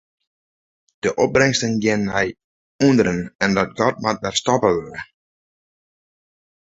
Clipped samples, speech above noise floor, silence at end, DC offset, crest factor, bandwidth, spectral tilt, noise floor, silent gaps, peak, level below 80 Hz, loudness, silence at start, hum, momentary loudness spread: under 0.1%; over 71 dB; 1.6 s; under 0.1%; 20 dB; 8.2 kHz; -4.5 dB/octave; under -90 dBFS; 2.44-2.79 s, 3.35-3.39 s; -2 dBFS; -50 dBFS; -19 LUFS; 1.05 s; none; 9 LU